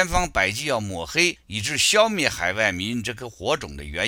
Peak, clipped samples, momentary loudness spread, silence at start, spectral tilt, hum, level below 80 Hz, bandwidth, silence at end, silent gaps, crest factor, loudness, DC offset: -2 dBFS; under 0.1%; 10 LU; 0 s; -2.5 dB/octave; none; -40 dBFS; 17 kHz; 0 s; none; 22 dB; -22 LUFS; under 0.1%